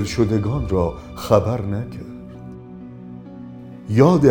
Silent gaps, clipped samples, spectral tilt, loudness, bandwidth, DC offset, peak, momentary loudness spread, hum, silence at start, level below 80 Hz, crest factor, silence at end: none; under 0.1%; -7.5 dB/octave; -19 LUFS; 18 kHz; under 0.1%; 0 dBFS; 21 LU; none; 0 s; -38 dBFS; 20 dB; 0 s